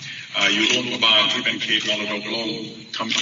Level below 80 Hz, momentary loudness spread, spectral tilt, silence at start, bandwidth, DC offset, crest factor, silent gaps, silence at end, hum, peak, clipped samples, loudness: -68 dBFS; 13 LU; 0.5 dB/octave; 0 s; 7.6 kHz; under 0.1%; 18 dB; none; 0 s; none; -4 dBFS; under 0.1%; -19 LUFS